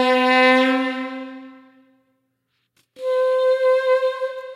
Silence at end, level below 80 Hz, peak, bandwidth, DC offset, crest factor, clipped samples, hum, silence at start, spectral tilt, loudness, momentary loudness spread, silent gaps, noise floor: 0 s; -90 dBFS; -4 dBFS; 11.5 kHz; under 0.1%; 18 dB; under 0.1%; none; 0 s; -3 dB/octave; -18 LUFS; 17 LU; none; -72 dBFS